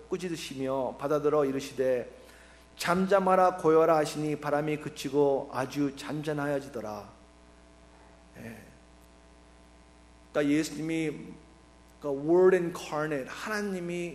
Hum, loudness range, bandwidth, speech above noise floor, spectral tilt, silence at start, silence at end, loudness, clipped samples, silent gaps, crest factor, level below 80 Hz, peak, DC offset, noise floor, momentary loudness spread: none; 12 LU; 15 kHz; 28 dB; -6 dB/octave; 0 s; 0 s; -29 LUFS; under 0.1%; none; 20 dB; -60 dBFS; -10 dBFS; under 0.1%; -56 dBFS; 16 LU